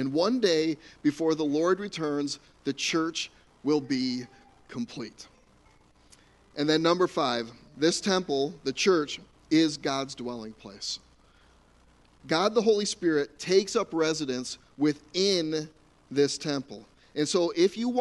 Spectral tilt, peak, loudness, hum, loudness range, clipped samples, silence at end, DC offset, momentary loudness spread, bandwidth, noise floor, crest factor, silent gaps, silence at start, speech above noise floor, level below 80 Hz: -4 dB/octave; -10 dBFS; -28 LUFS; none; 5 LU; under 0.1%; 0 s; under 0.1%; 13 LU; 11.5 kHz; -60 dBFS; 18 dB; none; 0 s; 33 dB; -64 dBFS